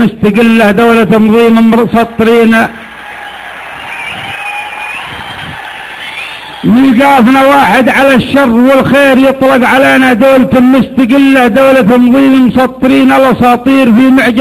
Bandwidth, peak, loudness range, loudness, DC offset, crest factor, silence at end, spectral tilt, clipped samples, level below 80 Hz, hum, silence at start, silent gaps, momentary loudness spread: 14.5 kHz; 0 dBFS; 12 LU; -6 LUFS; under 0.1%; 6 dB; 0 s; -6 dB/octave; 0.4%; -38 dBFS; none; 0 s; none; 16 LU